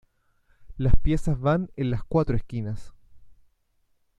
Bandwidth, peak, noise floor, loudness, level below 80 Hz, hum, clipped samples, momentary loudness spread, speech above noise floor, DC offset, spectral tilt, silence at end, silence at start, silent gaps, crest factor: 8.2 kHz; -6 dBFS; -68 dBFS; -27 LUFS; -32 dBFS; none; under 0.1%; 8 LU; 47 dB; under 0.1%; -8.5 dB/octave; 0.9 s; 0.6 s; none; 18 dB